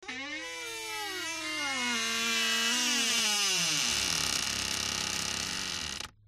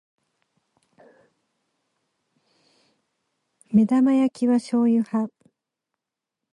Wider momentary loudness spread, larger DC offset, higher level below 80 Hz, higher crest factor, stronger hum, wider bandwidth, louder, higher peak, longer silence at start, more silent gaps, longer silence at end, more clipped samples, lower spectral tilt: first, 11 LU vs 8 LU; neither; first, -58 dBFS vs -72 dBFS; about the same, 18 dB vs 18 dB; neither; first, 16 kHz vs 11 kHz; second, -29 LUFS vs -21 LUFS; second, -14 dBFS vs -8 dBFS; second, 0 s vs 3.7 s; neither; second, 0.2 s vs 1.25 s; neither; second, 0 dB/octave vs -7.5 dB/octave